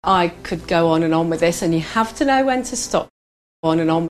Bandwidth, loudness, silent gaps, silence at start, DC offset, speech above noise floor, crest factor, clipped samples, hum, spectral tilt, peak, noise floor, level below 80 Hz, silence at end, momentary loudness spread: 13.5 kHz; -19 LUFS; 3.10-3.63 s; 0.05 s; under 0.1%; over 72 dB; 16 dB; under 0.1%; none; -5 dB/octave; -2 dBFS; under -90 dBFS; -44 dBFS; 0.05 s; 6 LU